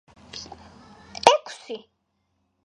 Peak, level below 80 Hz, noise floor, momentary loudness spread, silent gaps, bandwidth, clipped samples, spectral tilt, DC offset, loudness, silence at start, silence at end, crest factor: 0 dBFS; -60 dBFS; -73 dBFS; 22 LU; none; 11.5 kHz; under 0.1%; -1.5 dB/octave; under 0.1%; -20 LUFS; 0.35 s; 0.85 s; 28 dB